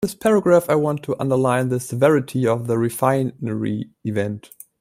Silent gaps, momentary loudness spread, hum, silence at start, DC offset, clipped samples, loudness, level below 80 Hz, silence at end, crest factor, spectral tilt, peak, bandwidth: none; 10 LU; none; 0 s; under 0.1%; under 0.1%; -20 LUFS; -58 dBFS; 0.4 s; 18 dB; -7 dB/octave; -2 dBFS; 16 kHz